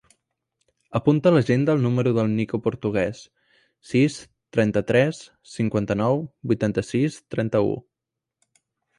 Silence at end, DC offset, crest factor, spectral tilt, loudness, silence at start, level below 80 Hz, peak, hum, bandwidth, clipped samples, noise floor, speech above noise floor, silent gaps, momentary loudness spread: 1.2 s; under 0.1%; 18 dB; -7.5 dB/octave; -23 LUFS; 0.9 s; -54 dBFS; -6 dBFS; none; 11 kHz; under 0.1%; -86 dBFS; 64 dB; none; 9 LU